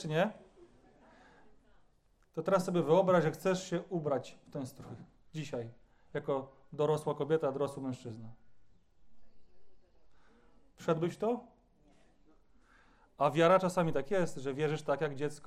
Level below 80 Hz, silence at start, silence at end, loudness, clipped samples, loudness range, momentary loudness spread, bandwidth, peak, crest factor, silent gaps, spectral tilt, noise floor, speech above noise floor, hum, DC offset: -68 dBFS; 0 s; 0 s; -33 LUFS; under 0.1%; 8 LU; 18 LU; 14.5 kHz; -14 dBFS; 20 dB; none; -6.5 dB/octave; -68 dBFS; 36 dB; none; under 0.1%